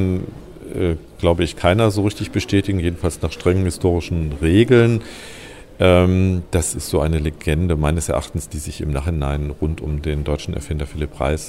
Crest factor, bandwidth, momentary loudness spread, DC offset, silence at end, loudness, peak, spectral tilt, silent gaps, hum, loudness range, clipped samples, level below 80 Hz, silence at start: 18 dB; 16 kHz; 13 LU; under 0.1%; 0 s; -19 LUFS; -2 dBFS; -6 dB/octave; none; none; 5 LU; under 0.1%; -30 dBFS; 0 s